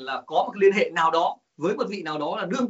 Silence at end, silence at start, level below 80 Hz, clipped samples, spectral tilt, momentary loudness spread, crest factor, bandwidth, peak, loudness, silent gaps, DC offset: 0 s; 0 s; -74 dBFS; under 0.1%; -3 dB/octave; 8 LU; 16 dB; 8 kHz; -8 dBFS; -24 LUFS; none; under 0.1%